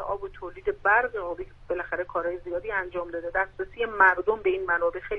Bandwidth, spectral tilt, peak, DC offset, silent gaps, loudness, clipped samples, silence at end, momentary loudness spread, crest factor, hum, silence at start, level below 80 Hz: 5.8 kHz; -6.5 dB/octave; -6 dBFS; under 0.1%; none; -26 LUFS; under 0.1%; 0 s; 13 LU; 20 dB; none; 0 s; -50 dBFS